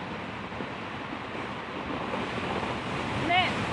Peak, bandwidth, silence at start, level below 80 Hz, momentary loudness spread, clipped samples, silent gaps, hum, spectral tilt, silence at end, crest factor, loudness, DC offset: -12 dBFS; 11.5 kHz; 0 s; -54 dBFS; 11 LU; under 0.1%; none; none; -5 dB/octave; 0 s; 20 dB; -31 LUFS; under 0.1%